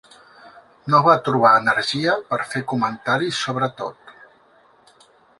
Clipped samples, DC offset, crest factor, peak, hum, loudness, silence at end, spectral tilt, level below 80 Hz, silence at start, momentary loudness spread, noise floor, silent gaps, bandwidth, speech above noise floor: under 0.1%; under 0.1%; 20 dB; -2 dBFS; none; -19 LUFS; 1.3 s; -5 dB/octave; -64 dBFS; 0.45 s; 10 LU; -55 dBFS; none; 11.5 kHz; 36 dB